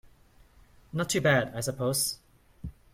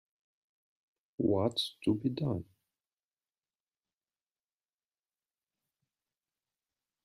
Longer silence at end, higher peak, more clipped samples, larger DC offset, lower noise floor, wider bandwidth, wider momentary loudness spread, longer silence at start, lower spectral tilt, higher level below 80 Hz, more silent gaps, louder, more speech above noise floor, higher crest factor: second, 0.2 s vs 4.6 s; first, -12 dBFS vs -18 dBFS; neither; neither; second, -58 dBFS vs under -90 dBFS; first, 16.5 kHz vs 14.5 kHz; first, 21 LU vs 8 LU; second, 0.95 s vs 1.2 s; second, -4 dB/octave vs -7 dB/octave; first, -54 dBFS vs -72 dBFS; neither; first, -28 LUFS vs -33 LUFS; second, 31 dB vs over 58 dB; about the same, 20 dB vs 22 dB